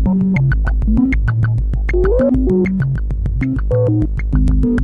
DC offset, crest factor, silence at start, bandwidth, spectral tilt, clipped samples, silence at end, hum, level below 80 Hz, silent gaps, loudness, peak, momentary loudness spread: under 0.1%; 12 dB; 0 s; 4.6 kHz; -10.5 dB/octave; under 0.1%; 0 s; none; -18 dBFS; none; -16 LUFS; -2 dBFS; 5 LU